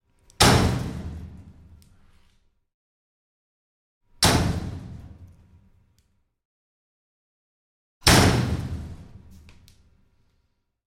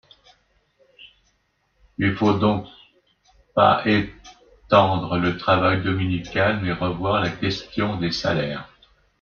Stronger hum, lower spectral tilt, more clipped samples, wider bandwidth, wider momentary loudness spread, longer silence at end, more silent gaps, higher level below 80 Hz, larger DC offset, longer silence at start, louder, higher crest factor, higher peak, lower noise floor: neither; second, -4 dB/octave vs -6.5 dB/octave; neither; first, 16.5 kHz vs 7 kHz; first, 24 LU vs 9 LU; first, 1.8 s vs 0.55 s; first, 2.74-4.01 s, 6.45-8.01 s vs none; first, -40 dBFS vs -50 dBFS; neither; second, 0.4 s vs 1 s; about the same, -21 LUFS vs -21 LUFS; about the same, 24 dB vs 20 dB; about the same, -2 dBFS vs -4 dBFS; about the same, -71 dBFS vs -68 dBFS